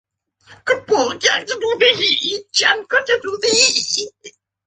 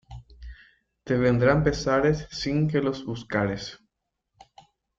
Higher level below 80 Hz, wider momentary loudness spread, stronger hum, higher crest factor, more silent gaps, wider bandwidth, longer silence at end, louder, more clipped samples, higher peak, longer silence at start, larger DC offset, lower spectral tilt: second, -62 dBFS vs -46 dBFS; second, 8 LU vs 14 LU; neither; about the same, 18 dB vs 20 dB; neither; first, 9.6 kHz vs 7.6 kHz; second, 0.35 s vs 1.25 s; first, -16 LUFS vs -25 LUFS; neither; first, 0 dBFS vs -6 dBFS; first, 0.5 s vs 0.1 s; neither; second, 0 dB/octave vs -6.5 dB/octave